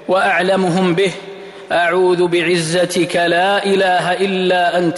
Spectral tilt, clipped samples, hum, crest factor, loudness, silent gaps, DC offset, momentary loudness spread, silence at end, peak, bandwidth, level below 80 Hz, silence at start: -5 dB/octave; under 0.1%; none; 10 dB; -15 LUFS; none; under 0.1%; 5 LU; 0 s; -6 dBFS; 12 kHz; -58 dBFS; 0 s